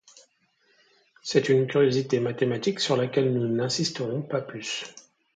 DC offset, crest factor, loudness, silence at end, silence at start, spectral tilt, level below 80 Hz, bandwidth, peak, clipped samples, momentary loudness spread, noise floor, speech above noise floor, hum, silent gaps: under 0.1%; 20 dB; -25 LUFS; 0.35 s; 1.25 s; -5 dB/octave; -70 dBFS; 9.2 kHz; -6 dBFS; under 0.1%; 10 LU; -67 dBFS; 42 dB; none; none